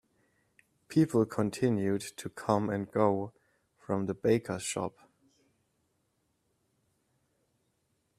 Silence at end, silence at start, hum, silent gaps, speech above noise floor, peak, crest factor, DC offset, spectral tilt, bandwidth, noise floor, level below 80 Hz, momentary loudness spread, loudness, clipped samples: 3.3 s; 0.9 s; none; none; 47 dB; -10 dBFS; 22 dB; under 0.1%; -6 dB/octave; 15 kHz; -77 dBFS; -70 dBFS; 9 LU; -31 LUFS; under 0.1%